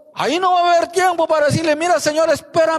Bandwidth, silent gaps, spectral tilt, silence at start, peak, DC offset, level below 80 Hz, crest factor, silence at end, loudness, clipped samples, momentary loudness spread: 13.5 kHz; none; -4 dB/octave; 0.15 s; -6 dBFS; under 0.1%; -54 dBFS; 10 dB; 0 s; -16 LUFS; under 0.1%; 3 LU